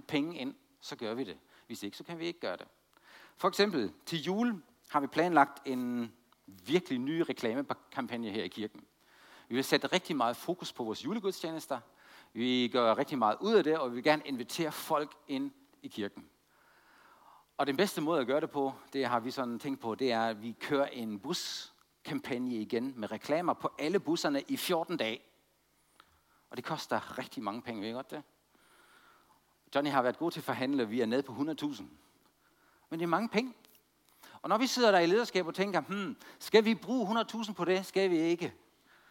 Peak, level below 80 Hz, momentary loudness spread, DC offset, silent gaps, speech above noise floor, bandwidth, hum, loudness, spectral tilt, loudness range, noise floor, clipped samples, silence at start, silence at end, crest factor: -10 dBFS; -80 dBFS; 14 LU; under 0.1%; none; 39 dB; 17 kHz; none; -33 LUFS; -4.5 dB/octave; 8 LU; -72 dBFS; under 0.1%; 0.1 s; 0.55 s; 24 dB